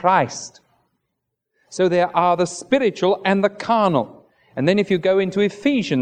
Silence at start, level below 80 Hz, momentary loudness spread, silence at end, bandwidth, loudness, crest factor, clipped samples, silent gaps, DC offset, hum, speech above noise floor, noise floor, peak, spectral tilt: 0 s; -64 dBFS; 11 LU; 0 s; 10 kHz; -19 LUFS; 18 dB; under 0.1%; none; under 0.1%; none; 59 dB; -77 dBFS; -2 dBFS; -5.5 dB/octave